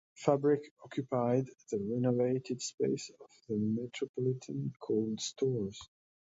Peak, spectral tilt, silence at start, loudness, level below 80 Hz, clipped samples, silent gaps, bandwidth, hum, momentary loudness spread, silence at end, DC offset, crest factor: -12 dBFS; -6 dB/octave; 0.2 s; -34 LUFS; -72 dBFS; under 0.1%; 0.71-0.76 s, 2.74-2.78 s, 4.09-4.14 s; 8 kHz; none; 9 LU; 0.45 s; under 0.1%; 22 dB